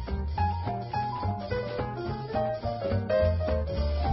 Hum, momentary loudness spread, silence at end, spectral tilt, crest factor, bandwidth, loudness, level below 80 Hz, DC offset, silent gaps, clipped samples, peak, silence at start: none; 7 LU; 0 s; -11 dB/octave; 14 dB; 5.8 kHz; -30 LUFS; -36 dBFS; under 0.1%; none; under 0.1%; -14 dBFS; 0 s